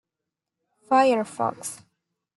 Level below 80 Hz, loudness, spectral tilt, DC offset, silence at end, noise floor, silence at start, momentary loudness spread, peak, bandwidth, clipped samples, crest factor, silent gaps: -78 dBFS; -23 LUFS; -4 dB/octave; under 0.1%; 0.6 s; -86 dBFS; 0.9 s; 16 LU; -8 dBFS; 12 kHz; under 0.1%; 20 dB; none